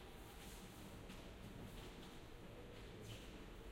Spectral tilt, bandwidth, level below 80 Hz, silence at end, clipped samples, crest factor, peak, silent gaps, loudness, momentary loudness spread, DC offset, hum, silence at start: -4.5 dB/octave; 16.5 kHz; -60 dBFS; 0 s; under 0.1%; 14 dB; -40 dBFS; none; -56 LUFS; 3 LU; under 0.1%; none; 0 s